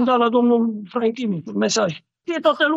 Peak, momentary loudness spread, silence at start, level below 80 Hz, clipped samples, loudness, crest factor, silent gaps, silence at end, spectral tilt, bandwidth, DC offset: -4 dBFS; 9 LU; 0 s; -70 dBFS; under 0.1%; -20 LUFS; 14 dB; none; 0 s; -4.5 dB/octave; 8 kHz; under 0.1%